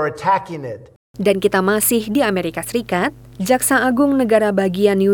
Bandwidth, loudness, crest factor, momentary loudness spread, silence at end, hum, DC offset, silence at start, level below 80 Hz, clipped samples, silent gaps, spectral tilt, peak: 20 kHz; -17 LUFS; 16 dB; 10 LU; 0 s; none; under 0.1%; 0 s; -50 dBFS; under 0.1%; 0.96-1.14 s; -4.5 dB/octave; -2 dBFS